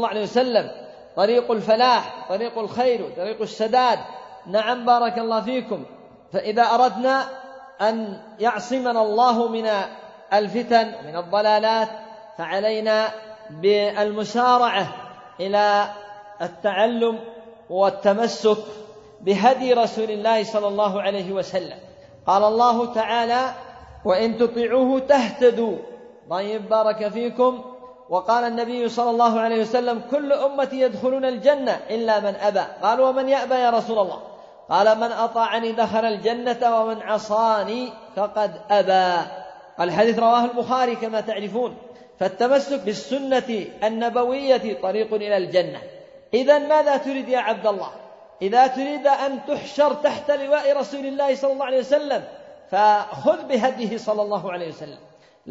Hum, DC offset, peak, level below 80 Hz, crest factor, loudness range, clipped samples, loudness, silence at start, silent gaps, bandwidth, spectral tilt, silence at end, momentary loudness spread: none; under 0.1%; -4 dBFS; -66 dBFS; 18 dB; 2 LU; under 0.1%; -21 LUFS; 0 s; none; 7.8 kHz; -5 dB/octave; 0 s; 12 LU